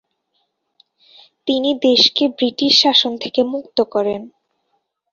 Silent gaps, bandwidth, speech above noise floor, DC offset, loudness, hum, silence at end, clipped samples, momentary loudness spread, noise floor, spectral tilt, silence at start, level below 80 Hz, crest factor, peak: none; 7.6 kHz; 53 dB; under 0.1%; -15 LUFS; none; 0.85 s; under 0.1%; 10 LU; -69 dBFS; -3 dB/octave; 1.45 s; -62 dBFS; 18 dB; 0 dBFS